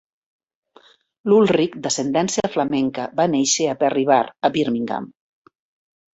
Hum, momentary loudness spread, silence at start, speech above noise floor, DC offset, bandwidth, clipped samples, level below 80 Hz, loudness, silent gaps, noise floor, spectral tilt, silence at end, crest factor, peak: none; 8 LU; 1.25 s; 34 dB; under 0.1%; 8.2 kHz; under 0.1%; -62 dBFS; -20 LUFS; none; -53 dBFS; -4 dB/octave; 1.05 s; 18 dB; -4 dBFS